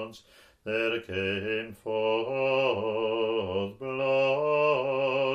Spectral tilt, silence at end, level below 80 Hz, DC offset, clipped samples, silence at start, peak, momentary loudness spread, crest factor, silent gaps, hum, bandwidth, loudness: -6 dB/octave; 0 s; -68 dBFS; under 0.1%; under 0.1%; 0 s; -14 dBFS; 8 LU; 14 dB; none; none; 8.8 kHz; -28 LUFS